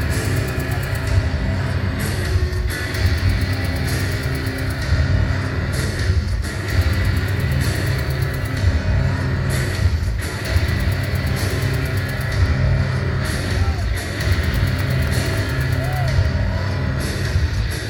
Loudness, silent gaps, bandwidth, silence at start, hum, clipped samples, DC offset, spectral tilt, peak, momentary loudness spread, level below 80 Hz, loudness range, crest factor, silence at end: -21 LUFS; none; 17.5 kHz; 0 s; none; under 0.1%; 0.3%; -5.5 dB/octave; -4 dBFS; 3 LU; -24 dBFS; 1 LU; 14 dB; 0 s